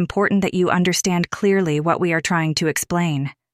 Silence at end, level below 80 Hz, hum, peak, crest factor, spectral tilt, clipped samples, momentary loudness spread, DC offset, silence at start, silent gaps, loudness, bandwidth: 0.2 s; -50 dBFS; none; -4 dBFS; 14 dB; -5 dB/octave; under 0.1%; 3 LU; under 0.1%; 0 s; none; -19 LUFS; 15.5 kHz